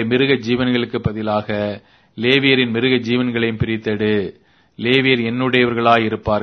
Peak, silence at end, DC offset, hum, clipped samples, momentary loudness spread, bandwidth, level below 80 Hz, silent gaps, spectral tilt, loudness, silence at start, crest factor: 0 dBFS; 0 s; under 0.1%; none; under 0.1%; 8 LU; 6.4 kHz; -46 dBFS; none; -7 dB/octave; -17 LUFS; 0 s; 18 dB